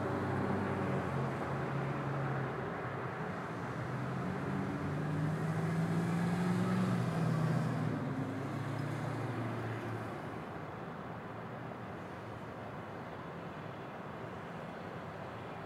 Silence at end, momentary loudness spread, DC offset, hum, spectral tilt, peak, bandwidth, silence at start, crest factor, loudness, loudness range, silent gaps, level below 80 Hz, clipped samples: 0 s; 11 LU; under 0.1%; none; -7.5 dB/octave; -22 dBFS; 14 kHz; 0 s; 16 dB; -38 LUFS; 10 LU; none; -64 dBFS; under 0.1%